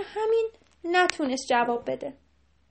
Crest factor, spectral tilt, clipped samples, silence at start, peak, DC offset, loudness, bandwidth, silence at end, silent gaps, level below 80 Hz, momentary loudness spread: 24 dB; -2.5 dB/octave; under 0.1%; 0 s; -2 dBFS; under 0.1%; -26 LUFS; 8.8 kHz; 0.6 s; none; -64 dBFS; 12 LU